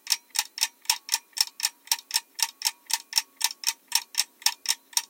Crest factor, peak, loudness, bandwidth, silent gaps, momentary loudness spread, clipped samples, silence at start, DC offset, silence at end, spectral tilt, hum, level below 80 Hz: 26 dB; -4 dBFS; -26 LUFS; 17 kHz; none; 4 LU; under 0.1%; 0.05 s; under 0.1%; 0.05 s; 6.5 dB/octave; none; under -90 dBFS